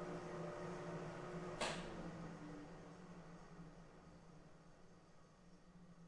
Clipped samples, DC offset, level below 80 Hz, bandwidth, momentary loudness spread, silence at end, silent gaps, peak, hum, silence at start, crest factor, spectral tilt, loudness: under 0.1%; under 0.1%; -66 dBFS; 11 kHz; 21 LU; 0 s; none; -28 dBFS; none; 0 s; 24 dB; -5 dB/octave; -51 LUFS